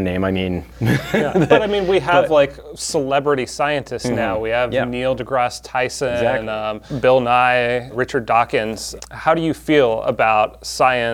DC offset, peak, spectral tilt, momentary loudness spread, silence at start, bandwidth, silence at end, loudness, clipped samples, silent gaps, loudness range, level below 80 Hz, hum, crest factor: under 0.1%; 0 dBFS; -5 dB/octave; 8 LU; 0 s; 18 kHz; 0 s; -18 LUFS; under 0.1%; none; 3 LU; -44 dBFS; none; 18 dB